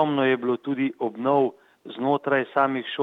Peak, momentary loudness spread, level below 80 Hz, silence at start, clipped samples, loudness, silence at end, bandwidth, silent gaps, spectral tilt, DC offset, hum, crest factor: -6 dBFS; 6 LU; -78 dBFS; 0 s; under 0.1%; -24 LUFS; 0 s; 4.4 kHz; none; -8 dB/octave; under 0.1%; none; 18 dB